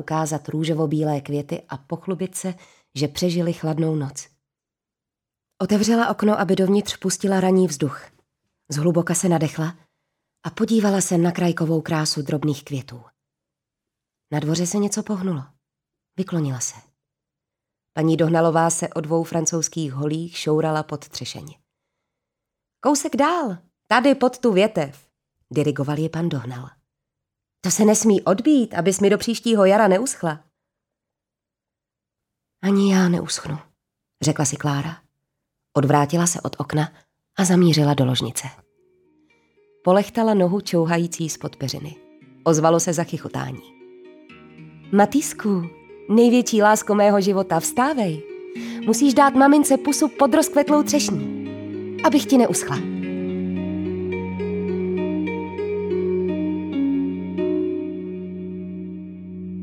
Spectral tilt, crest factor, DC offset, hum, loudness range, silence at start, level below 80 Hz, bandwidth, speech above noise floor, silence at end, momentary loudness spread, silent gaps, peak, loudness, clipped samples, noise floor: -5 dB/octave; 18 dB; under 0.1%; none; 8 LU; 0 s; -62 dBFS; 17.5 kHz; 68 dB; 0 s; 15 LU; none; -2 dBFS; -21 LUFS; under 0.1%; -87 dBFS